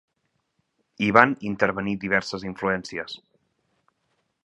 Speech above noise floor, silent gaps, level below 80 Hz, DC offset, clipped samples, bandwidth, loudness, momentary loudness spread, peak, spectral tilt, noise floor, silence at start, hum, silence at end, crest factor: 51 dB; none; -58 dBFS; under 0.1%; under 0.1%; 11 kHz; -23 LUFS; 16 LU; 0 dBFS; -5.5 dB/octave; -75 dBFS; 1 s; none; 1.3 s; 26 dB